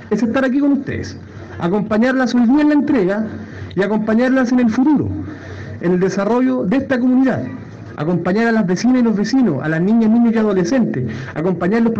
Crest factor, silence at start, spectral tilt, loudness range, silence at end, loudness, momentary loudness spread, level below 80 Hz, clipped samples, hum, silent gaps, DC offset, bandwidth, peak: 12 dB; 0 s; -7 dB/octave; 2 LU; 0 s; -16 LUFS; 13 LU; -50 dBFS; under 0.1%; none; none; under 0.1%; 7.6 kHz; -4 dBFS